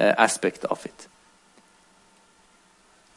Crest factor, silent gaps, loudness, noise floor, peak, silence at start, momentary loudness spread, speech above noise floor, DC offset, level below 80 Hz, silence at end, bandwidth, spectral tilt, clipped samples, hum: 24 dB; none; -24 LUFS; -59 dBFS; -4 dBFS; 0 s; 22 LU; 35 dB; under 0.1%; -72 dBFS; 2.15 s; 11.5 kHz; -3 dB/octave; under 0.1%; none